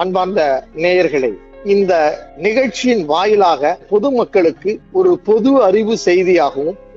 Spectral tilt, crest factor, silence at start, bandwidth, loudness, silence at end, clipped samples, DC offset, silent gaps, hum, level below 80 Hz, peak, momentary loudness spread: -5.5 dB/octave; 12 dB; 0 s; 7.8 kHz; -14 LUFS; 0.2 s; under 0.1%; under 0.1%; none; none; -48 dBFS; -2 dBFS; 7 LU